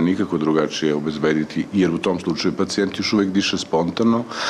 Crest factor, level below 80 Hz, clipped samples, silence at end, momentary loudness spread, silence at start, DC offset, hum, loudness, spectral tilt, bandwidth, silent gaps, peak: 12 dB; -54 dBFS; under 0.1%; 0 s; 3 LU; 0 s; under 0.1%; none; -20 LUFS; -5 dB/octave; 11.5 kHz; none; -8 dBFS